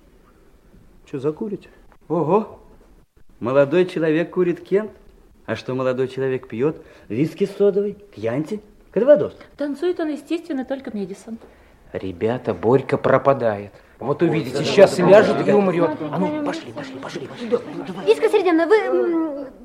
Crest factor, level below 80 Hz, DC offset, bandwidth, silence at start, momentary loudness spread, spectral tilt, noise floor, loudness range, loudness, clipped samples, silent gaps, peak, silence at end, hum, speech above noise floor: 20 dB; -56 dBFS; under 0.1%; 12.5 kHz; 1.15 s; 16 LU; -7 dB/octave; -51 dBFS; 7 LU; -20 LUFS; under 0.1%; none; 0 dBFS; 0 s; none; 32 dB